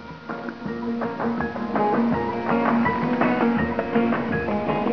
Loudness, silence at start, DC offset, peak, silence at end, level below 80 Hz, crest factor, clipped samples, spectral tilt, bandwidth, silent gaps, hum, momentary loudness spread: -23 LUFS; 0 s; 0.3%; -6 dBFS; 0 s; -48 dBFS; 18 dB; under 0.1%; -8.5 dB/octave; 5.4 kHz; none; none; 10 LU